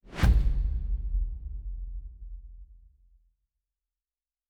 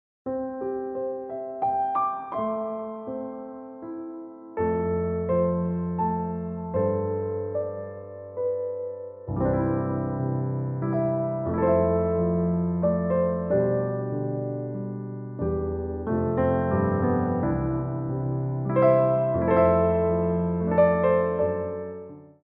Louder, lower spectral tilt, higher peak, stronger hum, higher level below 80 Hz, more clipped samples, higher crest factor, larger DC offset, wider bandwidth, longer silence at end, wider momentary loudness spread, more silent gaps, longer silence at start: second, -31 LUFS vs -26 LUFS; second, -6.5 dB/octave vs -10 dB/octave; about the same, -10 dBFS vs -8 dBFS; neither; first, -30 dBFS vs -46 dBFS; neither; about the same, 20 dB vs 18 dB; neither; first, 8.8 kHz vs 3.6 kHz; first, 1.75 s vs 0.15 s; first, 22 LU vs 13 LU; neither; second, 0.05 s vs 0.25 s